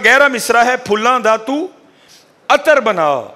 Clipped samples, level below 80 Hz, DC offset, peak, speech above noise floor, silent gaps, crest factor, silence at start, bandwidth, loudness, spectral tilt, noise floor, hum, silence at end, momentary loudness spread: under 0.1%; -56 dBFS; under 0.1%; 0 dBFS; 34 dB; none; 14 dB; 0 s; 16 kHz; -13 LUFS; -2.5 dB/octave; -46 dBFS; none; 0.05 s; 11 LU